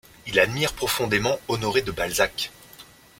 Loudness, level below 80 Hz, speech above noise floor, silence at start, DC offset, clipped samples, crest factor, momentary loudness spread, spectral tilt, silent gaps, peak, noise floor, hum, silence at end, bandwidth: -24 LUFS; -48 dBFS; 25 dB; 0.25 s; under 0.1%; under 0.1%; 20 dB; 5 LU; -3.5 dB/octave; none; -4 dBFS; -49 dBFS; none; 0.35 s; 16.5 kHz